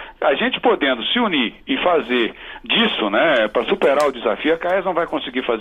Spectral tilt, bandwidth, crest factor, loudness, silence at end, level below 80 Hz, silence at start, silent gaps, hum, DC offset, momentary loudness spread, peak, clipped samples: -4.5 dB/octave; 13 kHz; 16 dB; -18 LUFS; 0 s; -50 dBFS; 0 s; none; none; under 0.1%; 6 LU; -4 dBFS; under 0.1%